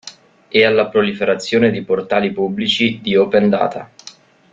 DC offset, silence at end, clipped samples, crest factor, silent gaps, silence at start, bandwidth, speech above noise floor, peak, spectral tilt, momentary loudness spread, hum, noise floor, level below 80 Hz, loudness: under 0.1%; 0.45 s; under 0.1%; 16 dB; none; 0.05 s; 7.8 kHz; 27 dB; 0 dBFS; -5.5 dB/octave; 8 LU; none; -42 dBFS; -56 dBFS; -16 LUFS